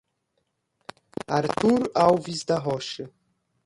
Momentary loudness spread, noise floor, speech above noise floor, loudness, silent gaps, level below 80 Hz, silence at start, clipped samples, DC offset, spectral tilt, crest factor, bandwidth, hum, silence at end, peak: 18 LU; -75 dBFS; 52 dB; -24 LUFS; none; -60 dBFS; 1.3 s; under 0.1%; under 0.1%; -5.5 dB/octave; 20 dB; 11.5 kHz; none; 0.6 s; -6 dBFS